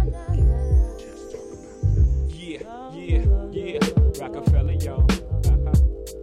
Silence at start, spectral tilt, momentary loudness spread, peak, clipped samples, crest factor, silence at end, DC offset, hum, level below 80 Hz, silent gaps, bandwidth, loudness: 0 s; -7 dB/octave; 16 LU; -6 dBFS; under 0.1%; 14 dB; 0 s; under 0.1%; none; -22 dBFS; none; 13 kHz; -22 LUFS